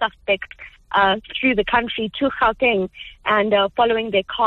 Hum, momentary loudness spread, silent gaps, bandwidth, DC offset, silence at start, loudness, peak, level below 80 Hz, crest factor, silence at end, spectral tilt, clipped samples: none; 8 LU; none; 6 kHz; under 0.1%; 0 s; -19 LUFS; -4 dBFS; -46 dBFS; 16 dB; 0 s; -6.5 dB/octave; under 0.1%